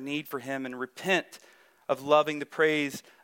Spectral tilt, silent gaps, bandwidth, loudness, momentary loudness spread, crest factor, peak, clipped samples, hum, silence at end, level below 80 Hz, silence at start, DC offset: -4 dB/octave; none; 17.5 kHz; -28 LUFS; 11 LU; 20 dB; -10 dBFS; under 0.1%; none; 0.25 s; -78 dBFS; 0 s; under 0.1%